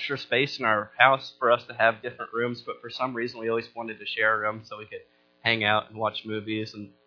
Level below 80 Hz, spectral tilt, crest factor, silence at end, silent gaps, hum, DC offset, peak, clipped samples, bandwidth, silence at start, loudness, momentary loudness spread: -72 dBFS; -5.5 dB/octave; 26 dB; 0.2 s; none; none; under 0.1%; 0 dBFS; under 0.1%; 5.4 kHz; 0 s; -26 LUFS; 16 LU